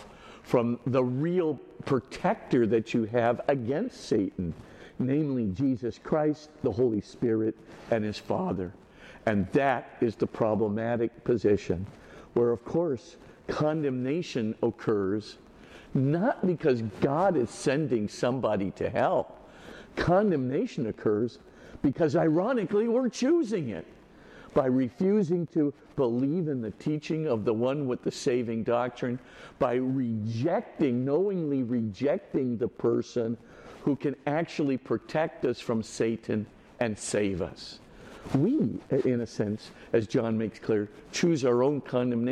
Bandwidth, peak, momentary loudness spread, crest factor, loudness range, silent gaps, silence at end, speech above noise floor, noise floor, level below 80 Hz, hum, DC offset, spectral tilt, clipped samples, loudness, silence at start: 11 kHz; -10 dBFS; 9 LU; 18 dB; 3 LU; none; 0 s; 24 dB; -51 dBFS; -58 dBFS; none; under 0.1%; -7 dB/octave; under 0.1%; -29 LUFS; 0 s